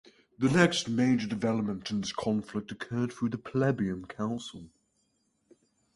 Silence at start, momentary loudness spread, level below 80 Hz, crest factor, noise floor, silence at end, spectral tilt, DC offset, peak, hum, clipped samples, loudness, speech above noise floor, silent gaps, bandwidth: 0.4 s; 12 LU; -62 dBFS; 24 dB; -74 dBFS; 1.3 s; -5.5 dB/octave; under 0.1%; -6 dBFS; none; under 0.1%; -30 LUFS; 45 dB; none; 11.5 kHz